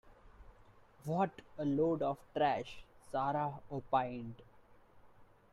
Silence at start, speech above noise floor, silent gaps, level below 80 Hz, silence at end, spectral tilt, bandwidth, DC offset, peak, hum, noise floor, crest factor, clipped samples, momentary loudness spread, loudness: 0.05 s; 26 dB; none; -66 dBFS; 0.3 s; -7.5 dB/octave; 13.5 kHz; under 0.1%; -18 dBFS; none; -62 dBFS; 20 dB; under 0.1%; 16 LU; -37 LUFS